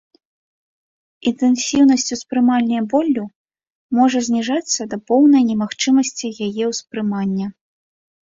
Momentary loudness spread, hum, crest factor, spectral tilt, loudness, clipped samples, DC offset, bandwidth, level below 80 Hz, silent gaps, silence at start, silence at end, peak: 10 LU; none; 16 dB; -4 dB/octave; -17 LUFS; under 0.1%; under 0.1%; 7.8 kHz; -60 dBFS; 3.35-3.45 s, 3.70-3.89 s; 1.25 s; 0.8 s; -2 dBFS